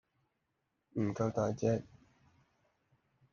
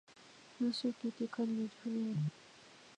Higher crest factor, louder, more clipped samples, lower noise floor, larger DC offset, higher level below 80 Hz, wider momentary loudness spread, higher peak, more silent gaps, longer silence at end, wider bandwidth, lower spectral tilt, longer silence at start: first, 22 dB vs 14 dB; first, -36 LUFS vs -39 LUFS; neither; first, -83 dBFS vs -60 dBFS; neither; first, -70 dBFS vs -84 dBFS; second, 5 LU vs 21 LU; first, -18 dBFS vs -26 dBFS; neither; first, 1.5 s vs 0.05 s; second, 7.2 kHz vs 10 kHz; first, -8 dB/octave vs -6.5 dB/octave; first, 0.95 s vs 0.1 s